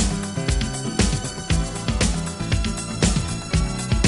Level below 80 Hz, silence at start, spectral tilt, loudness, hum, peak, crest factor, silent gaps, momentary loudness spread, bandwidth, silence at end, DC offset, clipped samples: -26 dBFS; 0 s; -4.5 dB/octave; -23 LUFS; none; -4 dBFS; 18 dB; none; 4 LU; 11.5 kHz; 0 s; under 0.1%; under 0.1%